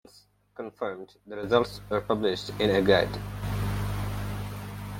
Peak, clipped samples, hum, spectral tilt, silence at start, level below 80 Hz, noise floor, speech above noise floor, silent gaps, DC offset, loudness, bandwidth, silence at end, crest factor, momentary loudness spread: -6 dBFS; under 0.1%; 50 Hz at -40 dBFS; -6 dB/octave; 0.15 s; -44 dBFS; -59 dBFS; 32 dB; none; under 0.1%; -28 LUFS; 17 kHz; 0 s; 22 dB; 17 LU